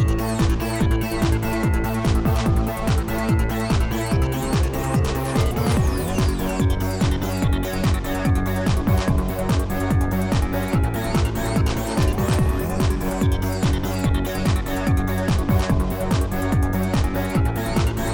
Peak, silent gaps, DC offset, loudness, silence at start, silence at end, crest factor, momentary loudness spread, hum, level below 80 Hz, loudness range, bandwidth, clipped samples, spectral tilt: -6 dBFS; none; under 0.1%; -22 LUFS; 0 s; 0 s; 14 dB; 2 LU; none; -26 dBFS; 0 LU; 19 kHz; under 0.1%; -6.5 dB/octave